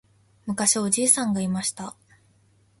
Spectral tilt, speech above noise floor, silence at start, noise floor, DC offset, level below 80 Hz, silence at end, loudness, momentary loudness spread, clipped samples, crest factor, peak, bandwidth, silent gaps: -3 dB/octave; 37 dB; 0.45 s; -61 dBFS; under 0.1%; -64 dBFS; 0.9 s; -22 LUFS; 19 LU; under 0.1%; 24 dB; -2 dBFS; 12 kHz; none